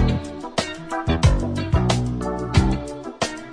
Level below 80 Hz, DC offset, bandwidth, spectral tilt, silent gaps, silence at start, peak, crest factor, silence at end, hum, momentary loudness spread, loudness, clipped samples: -28 dBFS; under 0.1%; 10.5 kHz; -6 dB/octave; none; 0 s; -4 dBFS; 18 dB; 0 s; none; 8 LU; -23 LUFS; under 0.1%